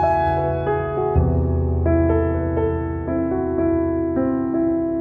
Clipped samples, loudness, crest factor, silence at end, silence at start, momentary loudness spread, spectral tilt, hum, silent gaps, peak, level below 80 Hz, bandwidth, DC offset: under 0.1%; -21 LUFS; 14 dB; 0 s; 0 s; 4 LU; -11.5 dB/octave; none; none; -6 dBFS; -30 dBFS; 4.5 kHz; under 0.1%